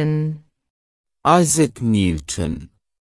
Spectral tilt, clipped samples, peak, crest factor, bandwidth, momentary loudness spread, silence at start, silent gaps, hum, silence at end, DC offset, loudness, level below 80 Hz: -5 dB/octave; under 0.1%; -2 dBFS; 18 dB; 12 kHz; 13 LU; 0 s; 0.70-1.04 s; none; 0.35 s; under 0.1%; -19 LUFS; -44 dBFS